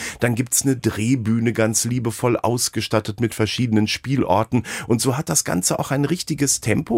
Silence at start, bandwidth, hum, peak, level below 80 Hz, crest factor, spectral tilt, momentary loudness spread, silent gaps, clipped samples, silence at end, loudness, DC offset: 0 s; 16 kHz; none; -2 dBFS; -50 dBFS; 18 dB; -4.5 dB/octave; 4 LU; none; under 0.1%; 0 s; -20 LUFS; under 0.1%